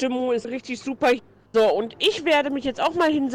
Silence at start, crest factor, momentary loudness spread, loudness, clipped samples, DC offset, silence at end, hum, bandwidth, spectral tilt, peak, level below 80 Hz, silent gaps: 0 s; 14 dB; 7 LU; -23 LUFS; under 0.1%; under 0.1%; 0 s; none; 17 kHz; -4 dB/octave; -8 dBFS; -58 dBFS; none